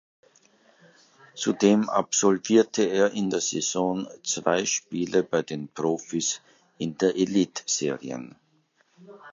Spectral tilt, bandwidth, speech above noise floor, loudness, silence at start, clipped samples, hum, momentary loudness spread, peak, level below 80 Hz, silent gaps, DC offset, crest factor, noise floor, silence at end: -4 dB/octave; 7.8 kHz; 42 dB; -25 LUFS; 1.35 s; under 0.1%; none; 13 LU; -6 dBFS; -68 dBFS; none; under 0.1%; 20 dB; -66 dBFS; 0 s